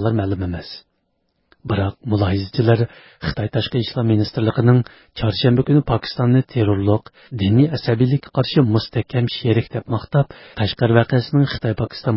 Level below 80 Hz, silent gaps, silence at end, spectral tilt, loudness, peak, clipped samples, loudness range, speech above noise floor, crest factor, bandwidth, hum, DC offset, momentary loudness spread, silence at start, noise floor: -40 dBFS; none; 0 s; -11.5 dB/octave; -19 LUFS; -2 dBFS; under 0.1%; 4 LU; 51 dB; 18 dB; 5.8 kHz; none; under 0.1%; 9 LU; 0 s; -69 dBFS